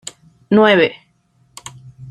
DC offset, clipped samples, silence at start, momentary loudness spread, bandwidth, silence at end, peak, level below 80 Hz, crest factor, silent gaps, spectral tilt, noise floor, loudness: under 0.1%; under 0.1%; 0.5 s; 25 LU; 12 kHz; 0 s; -2 dBFS; -58 dBFS; 16 dB; none; -5 dB/octave; -58 dBFS; -13 LUFS